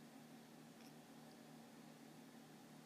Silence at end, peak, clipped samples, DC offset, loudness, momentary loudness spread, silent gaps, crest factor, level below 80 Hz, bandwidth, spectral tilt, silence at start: 0 s; -48 dBFS; under 0.1%; under 0.1%; -61 LUFS; 1 LU; none; 14 dB; under -90 dBFS; 15.5 kHz; -4.5 dB/octave; 0 s